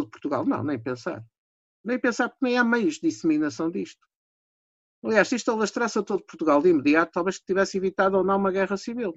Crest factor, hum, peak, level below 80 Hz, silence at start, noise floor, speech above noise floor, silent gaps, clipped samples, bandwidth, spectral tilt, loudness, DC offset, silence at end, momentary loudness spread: 18 dB; none; -6 dBFS; -64 dBFS; 0 s; under -90 dBFS; over 66 dB; 1.38-1.84 s, 4.16-5.02 s; under 0.1%; 8 kHz; -5 dB/octave; -24 LUFS; under 0.1%; 0 s; 10 LU